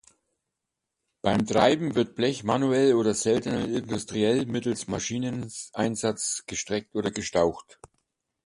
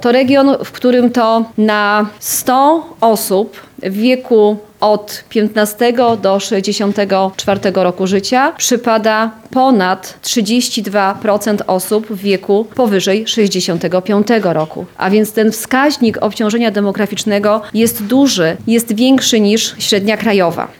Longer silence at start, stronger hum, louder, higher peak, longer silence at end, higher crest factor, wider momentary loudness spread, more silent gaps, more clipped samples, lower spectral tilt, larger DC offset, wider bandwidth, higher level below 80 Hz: first, 1.25 s vs 0 s; neither; second, -26 LUFS vs -13 LUFS; second, -6 dBFS vs -2 dBFS; first, 0.85 s vs 0.1 s; first, 22 dB vs 12 dB; first, 9 LU vs 5 LU; neither; neither; about the same, -4.5 dB/octave vs -4 dB/octave; neither; second, 11.5 kHz vs 17.5 kHz; about the same, -56 dBFS vs -56 dBFS